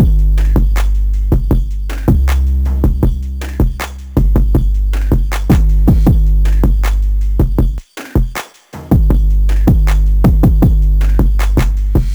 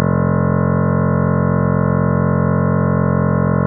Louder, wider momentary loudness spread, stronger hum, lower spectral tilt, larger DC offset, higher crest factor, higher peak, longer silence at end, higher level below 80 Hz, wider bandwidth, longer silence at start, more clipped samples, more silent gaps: about the same, -14 LUFS vs -16 LUFS; first, 7 LU vs 0 LU; neither; about the same, -7.5 dB/octave vs -7 dB/octave; neither; about the same, 10 dB vs 14 dB; about the same, 0 dBFS vs 0 dBFS; about the same, 0 s vs 0 s; first, -12 dBFS vs -36 dBFS; first, 16.5 kHz vs 2.1 kHz; about the same, 0 s vs 0 s; neither; neither